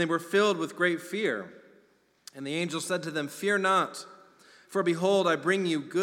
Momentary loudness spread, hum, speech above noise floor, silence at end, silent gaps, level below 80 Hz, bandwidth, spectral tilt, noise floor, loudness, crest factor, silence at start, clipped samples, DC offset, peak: 13 LU; none; 37 dB; 0 s; none; -86 dBFS; 17 kHz; -4.5 dB/octave; -65 dBFS; -28 LUFS; 18 dB; 0 s; under 0.1%; under 0.1%; -12 dBFS